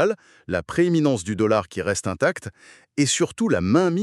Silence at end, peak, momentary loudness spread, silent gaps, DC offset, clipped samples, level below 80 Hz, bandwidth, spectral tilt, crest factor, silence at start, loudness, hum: 0 s; -4 dBFS; 11 LU; none; under 0.1%; under 0.1%; -54 dBFS; 12.5 kHz; -5 dB/octave; 18 dB; 0 s; -22 LUFS; none